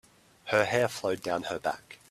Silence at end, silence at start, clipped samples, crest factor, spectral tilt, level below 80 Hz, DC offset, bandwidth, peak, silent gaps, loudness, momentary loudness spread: 0.15 s; 0.45 s; under 0.1%; 22 dB; -4 dB/octave; -66 dBFS; under 0.1%; 15 kHz; -8 dBFS; none; -29 LUFS; 12 LU